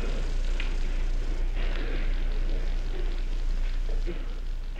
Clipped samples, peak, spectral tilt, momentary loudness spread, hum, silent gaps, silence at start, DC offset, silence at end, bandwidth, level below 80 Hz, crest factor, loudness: under 0.1%; -16 dBFS; -5.5 dB/octave; 2 LU; none; none; 0 s; under 0.1%; 0 s; 7.6 kHz; -26 dBFS; 10 dB; -34 LUFS